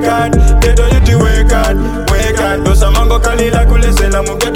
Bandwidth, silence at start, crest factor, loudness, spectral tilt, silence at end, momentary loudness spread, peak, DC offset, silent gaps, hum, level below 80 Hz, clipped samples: 16 kHz; 0 s; 8 dB; -11 LUFS; -5.5 dB/octave; 0 s; 4 LU; 0 dBFS; under 0.1%; none; 50 Hz at -20 dBFS; -10 dBFS; under 0.1%